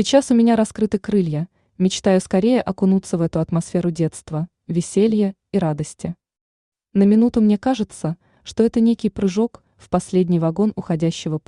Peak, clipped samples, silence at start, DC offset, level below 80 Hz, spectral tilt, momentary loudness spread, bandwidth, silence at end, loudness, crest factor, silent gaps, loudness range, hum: -2 dBFS; under 0.1%; 0 s; under 0.1%; -50 dBFS; -6.5 dB/octave; 12 LU; 11 kHz; 0.1 s; -19 LUFS; 16 dB; 6.41-6.72 s; 3 LU; none